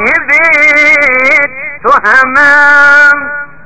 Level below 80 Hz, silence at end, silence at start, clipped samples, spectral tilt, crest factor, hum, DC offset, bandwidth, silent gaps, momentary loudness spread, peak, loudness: -42 dBFS; 0.2 s; 0 s; 5%; -3 dB/octave; 6 dB; none; 3%; 8 kHz; none; 9 LU; 0 dBFS; -4 LUFS